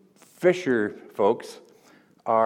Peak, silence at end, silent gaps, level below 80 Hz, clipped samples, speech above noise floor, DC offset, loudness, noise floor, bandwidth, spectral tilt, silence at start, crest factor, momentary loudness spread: -8 dBFS; 0 s; none; -72 dBFS; under 0.1%; 33 dB; under 0.1%; -25 LUFS; -57 dBFS; 14 kHz; -6 dB/octave; 0.4 s; 18 dB; 12 LU